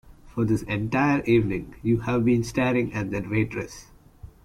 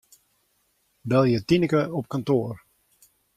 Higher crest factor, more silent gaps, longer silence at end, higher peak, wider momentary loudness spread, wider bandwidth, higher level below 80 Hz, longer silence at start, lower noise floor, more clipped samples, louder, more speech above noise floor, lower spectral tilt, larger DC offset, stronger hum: about the same, 16 dB vs 18 dB; neither; second, 0.2 s vs 0.8 s; about the same, -8 dBFS vs -8 dBFS; second, 9 LU vs 15 LU; about the same, 14.5 kHz vs 14.5 kHz; first, -48 dBFS vs -58 dBFS; second, 0.1 s vs 1.05 s; second, -47 dBFS vs -69 dBFS; neither; about the same, -24 LUFS vs -23 LUFS; second, 23 dB vs 47 dB; about the same, -7 dB/octave vs -7.5 dB/octave; neither; neither